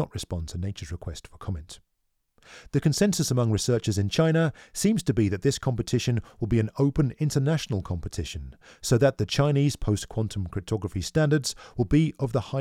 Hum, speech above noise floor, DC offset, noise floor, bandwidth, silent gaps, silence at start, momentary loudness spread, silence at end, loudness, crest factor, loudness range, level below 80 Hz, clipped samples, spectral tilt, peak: none; 49 dB; under 0.1%; -75 dBFS; 15.5 kHz; none; 0 s; 13 LU; 0 s; -26 LUFS; 18 dB; 3 LU; -44 dBFS; under 0.1%; -6 dB/octave; -8 dBFS